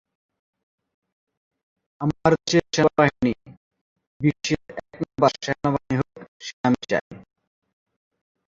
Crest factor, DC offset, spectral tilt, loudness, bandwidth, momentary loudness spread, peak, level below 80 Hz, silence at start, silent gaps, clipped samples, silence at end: 24 dB; under 0.1%; -5.5 dB/octave; -23 LUFS; 7.6 kHz; 14 LU; -2 dBFS; -54 dBFS; 2 s; 3.57-3.71 s, 3.81-3.96 s, 4.07-4.20 s, 6.28-6.40 s, 6.53-6.64 s, 7.01-7.11 s; under 0.1%; 1.35 s